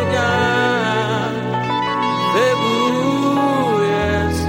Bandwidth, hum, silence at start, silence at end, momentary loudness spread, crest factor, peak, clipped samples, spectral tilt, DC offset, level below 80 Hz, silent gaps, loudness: 16.5 kHz; none; 0 s; 0 s; 4 LU; 12 dB; -4 dBFS; under 0.1%; -5.5 dB/octave; under 0.1%; -38 dBFS; none; -17 LUFS